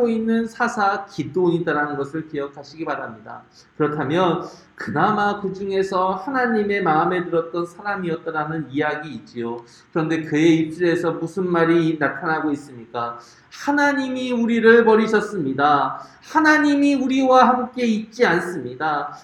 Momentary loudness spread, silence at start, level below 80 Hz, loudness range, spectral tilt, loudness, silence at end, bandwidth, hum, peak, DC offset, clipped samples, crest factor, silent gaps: 14 LU; 0 s; -62 dBFS; 7 LU; -6 dB/octave; -20 LUFS; 0.05 s; 12 kHz; none; 0 dBFS; under 0.1%; under 0.1%; 20 dB; none